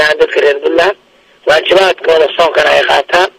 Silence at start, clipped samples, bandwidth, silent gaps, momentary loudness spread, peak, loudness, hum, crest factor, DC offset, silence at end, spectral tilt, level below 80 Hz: 0 s; under 0.1%; 15.5 kHz; none; 4 LU; 0 dBFS; -9 LUFS; none; 10 dB; under 0.1%; 0.1 s; -2.5 dB/octave; -46 dBFS